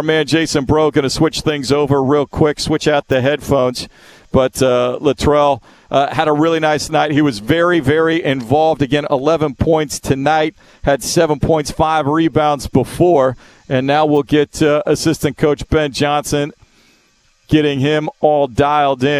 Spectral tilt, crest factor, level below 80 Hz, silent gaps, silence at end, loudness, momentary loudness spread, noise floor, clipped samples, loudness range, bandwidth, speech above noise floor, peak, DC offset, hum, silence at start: -5.5 dB/octave; 14 dB; -36 dBFS; none; 0 s; -15 LUFS; 4 LU; -55 dBFS; under 0.1%; 2 LU; 14 kHz; 41 dB; 0 dBFS; under 0.1%; none; 0 s